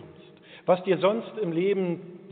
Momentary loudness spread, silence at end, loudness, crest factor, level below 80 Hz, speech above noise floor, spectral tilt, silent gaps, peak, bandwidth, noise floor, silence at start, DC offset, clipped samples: 9 LU; 0 s; -26 LUFS; 18 dB; -78 dBFS; 25 dB; -5.5 dB/octave; none; -8 dBFS; 4.5 kHz; -50 dBFS; 0 s; under 0.1%; under 0.1%